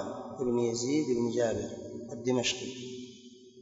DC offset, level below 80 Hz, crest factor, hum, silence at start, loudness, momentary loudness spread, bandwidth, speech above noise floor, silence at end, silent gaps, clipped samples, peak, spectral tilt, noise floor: under 0.1%; -64 dBFS; 16 dB; none; 0 s; -32 LUFS; 14 LU; 8 kHz; 22 dB; 0 s; none; under 0.1%; -16 dBFS; -4.5 dB/octave; -53 dBFS